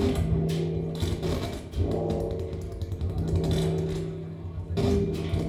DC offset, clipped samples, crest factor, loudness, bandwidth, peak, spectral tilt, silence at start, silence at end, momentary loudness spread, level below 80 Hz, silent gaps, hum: under 0.1%; under 0.1%; 16 dB; -29 LUFS; 14 kHz; -12 dBFS; -7.5 dB/octave; 0 s; 0 s; 9 LU; -36 dBFS; none; none